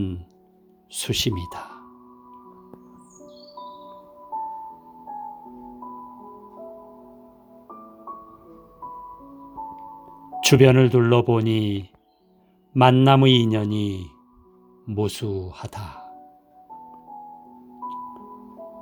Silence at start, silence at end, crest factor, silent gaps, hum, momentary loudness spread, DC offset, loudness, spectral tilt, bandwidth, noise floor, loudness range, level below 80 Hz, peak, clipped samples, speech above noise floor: 0 s; 0 s; 22 dB; none; none; 28 LU; under 0.1%; -20 LUFS; -6 dB/octave; over 20 kHz; -60 dBFS; 22 LU; -54 dBFS; -2 dBFS; under 0.1%; 41 dB